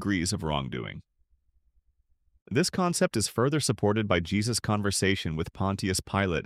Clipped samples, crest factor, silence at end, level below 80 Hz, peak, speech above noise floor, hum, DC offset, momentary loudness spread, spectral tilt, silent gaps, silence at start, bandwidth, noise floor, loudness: under 0.1%; 20 dB; 0 s; -50 dBFS; -10 dBFS; 41 dB; none; under 0.1%; 6 LU; -4.5 dB/octave; 2.42-2.46 s; 0 s; 15.5 kHz; -69 dBFS; -28 LUFS